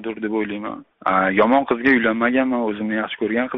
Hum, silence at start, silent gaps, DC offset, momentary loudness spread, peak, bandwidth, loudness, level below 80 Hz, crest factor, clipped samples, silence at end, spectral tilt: none; 0 s; none; under 0.1%; 10 LU; -4 dBFS; 5.6 kHz; -19 LUFS; -56 dBFS; 16 dB; under 0.1%; 0 s; -3.5 dB/octave